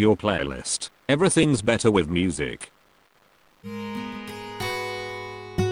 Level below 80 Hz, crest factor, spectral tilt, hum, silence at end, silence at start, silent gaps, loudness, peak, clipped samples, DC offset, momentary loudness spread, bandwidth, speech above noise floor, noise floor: -48 dBFS; 20 dB; -4.5 dB/octave; none; 0 s; 0 s; none; -25 LUFS; -6 dBFS; under 0.1%; under 0.1%; 15 LU; 16 kHz; 37 dB; -60 dBFS